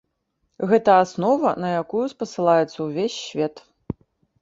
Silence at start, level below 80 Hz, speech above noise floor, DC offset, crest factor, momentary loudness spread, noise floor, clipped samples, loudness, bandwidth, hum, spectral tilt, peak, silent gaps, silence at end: 0.6 s; -56 dBFS; 53 dB; under 0.1%; 20 dB; 16 LU; -73 dBFS; under 0.1%; -21 LUFS; 7.8 kHz; none; -6 dB/octave; -2 dBFS; none; 0.5 s